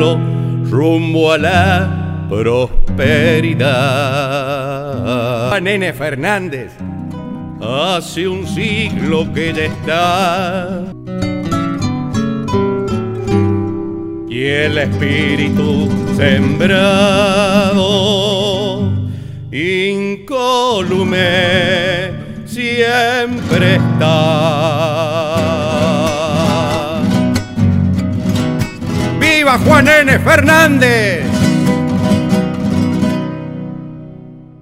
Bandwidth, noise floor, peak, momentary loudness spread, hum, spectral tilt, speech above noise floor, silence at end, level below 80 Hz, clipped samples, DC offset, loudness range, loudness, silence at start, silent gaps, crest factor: 16.5 kHz; -34 dBFS; 0 dBFS; 10 LU; none; -5.5 dB/octave; 21 dB; 0.15 s; -32 dBFS; under 0.1%; under 0.1%; 7 LU; -13 LUFS; 0 s; none; 14 dB